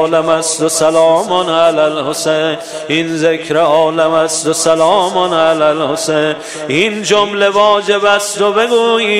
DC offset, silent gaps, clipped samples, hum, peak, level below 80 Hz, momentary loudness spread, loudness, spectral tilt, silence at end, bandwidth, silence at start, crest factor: 0.3%; none; under 0.1%; none; 0 dBFS; -58 dBFS; 5 LU; -12 LUFS; -3 dB/octave; 0 s; 15.5 kHz; 0 s; 12 dB